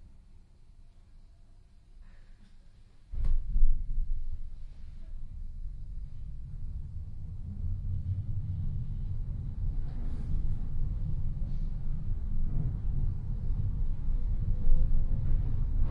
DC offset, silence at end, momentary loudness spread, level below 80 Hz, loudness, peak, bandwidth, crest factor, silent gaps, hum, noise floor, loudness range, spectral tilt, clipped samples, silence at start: under 0.1%; 0 s; 12 LU; -30 dBFS; -37 LUFS; -10 dBFS; 1.3 kHz; 18 dB; none; none; -54 dBFS; 9 LU; -10 dB/octave; under 0.1%; 0 s